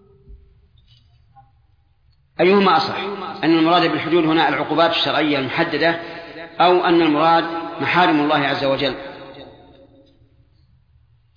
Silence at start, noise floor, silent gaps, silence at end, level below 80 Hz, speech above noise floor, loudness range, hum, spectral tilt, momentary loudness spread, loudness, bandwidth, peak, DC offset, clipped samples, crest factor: 0.3 s; -57 dBFS; none; 1.9 s; -54 dBFS; 41 dB; 5 LU; none; -6.5 dB/octave; 16 LU; -17 LUFS; 5.2 kHz; -2 dBFS; under 0.1%; under 0.1%; 16 dB